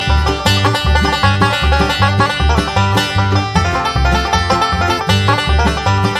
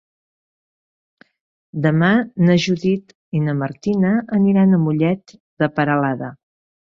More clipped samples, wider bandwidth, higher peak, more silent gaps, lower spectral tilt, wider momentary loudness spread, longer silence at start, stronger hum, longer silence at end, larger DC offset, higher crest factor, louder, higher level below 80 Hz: neither; first, 14.5 kHz vs 7.2 kHz; first, 0 dBFS vs -4 dBFS; second, none vs 3.15-3.32 s, 5.40-5.57 s; second, -5 dB/octave vs -7.5 dB/octave; second, 2 LU vs 10 LU; second, 0 s vs 1.75 s; neither; second, 0 s vs 0.55 s; neither; about the same, 12 dB vs 16 dB; first, -13 LUFS vs -18 LUFS; first, -20 dBFS vs -58 dBFS